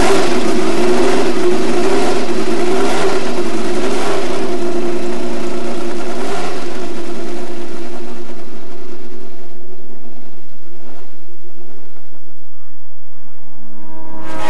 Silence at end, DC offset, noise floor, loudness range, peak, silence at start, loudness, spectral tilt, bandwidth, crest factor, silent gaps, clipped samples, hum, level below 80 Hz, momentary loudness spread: 0 s; 50%; -51 dBFS; 22 LU; 0 dBFS; 0 s; -19 LUFS; -5 dB/octave; 11.5 kHz; 14 dB; none; under 0.1%; none; -48 dBFS; 24 LU